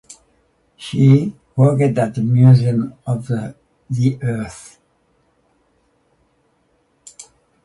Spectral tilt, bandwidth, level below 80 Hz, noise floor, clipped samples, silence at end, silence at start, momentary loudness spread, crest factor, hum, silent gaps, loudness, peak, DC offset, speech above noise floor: -8.5 dB/octave; 11.5 kHz; -54 dBFS; -62 dBFS; under 0.1%; 0.45 s; 0.8 s; 21 LU; 18 dB; none; none; -16 LUFS; 0 dBFS; under 0.1%; 47 dB